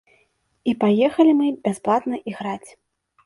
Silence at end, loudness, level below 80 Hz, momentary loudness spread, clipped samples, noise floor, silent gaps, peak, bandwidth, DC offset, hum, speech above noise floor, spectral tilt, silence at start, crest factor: 0.6 s; -20 LUFS; -64 dBFS; 13 LU; under 0.1%; -65 dBFS; none; -4 dBFS; 11.5 kHz; under 0.1%; none; 45 dB; -6.5 dB/octave; 0.65 s; 18 dB